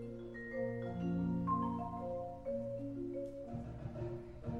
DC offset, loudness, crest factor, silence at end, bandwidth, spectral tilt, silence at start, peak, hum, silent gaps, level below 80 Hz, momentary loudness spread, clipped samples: under 0.1%; -41 LUFS; 16 dB; 0 s; 6.6 kHz; -9.5 dB/octave; 0 s; -24 dBFS; none; none; -58 dBFS; 9 LU; under 0.1%